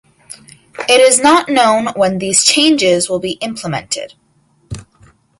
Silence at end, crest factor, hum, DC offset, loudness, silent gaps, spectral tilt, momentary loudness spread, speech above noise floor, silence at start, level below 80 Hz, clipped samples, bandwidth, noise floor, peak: 0.6 s; 14 dB; none; under 0.1%; -12 LUFS; none; -2.5 dB/octave; 23 LU; 43 dB; 0.3 s; -48 dBFS; under 0.1%; 16 kHz; -55 dBFS; 0 dBFS